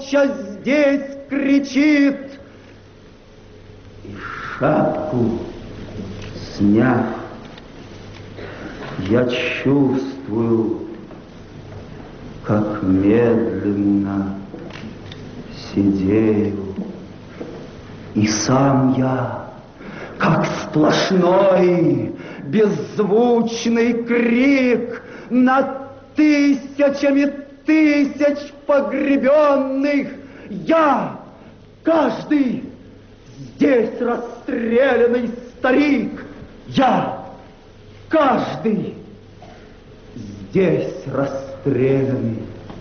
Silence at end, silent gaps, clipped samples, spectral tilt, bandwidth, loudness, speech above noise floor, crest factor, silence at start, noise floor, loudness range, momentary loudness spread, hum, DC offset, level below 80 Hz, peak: 0 s; none; under 0.1%; -5.5 dB/octave; 6.8 kHz; -18 LUFS; 27 dB; 12 dB; 0 s; -43 dBFS; 6 LU; 21 LU; none; under 0.1%; -48 dBFS; -6 dBFS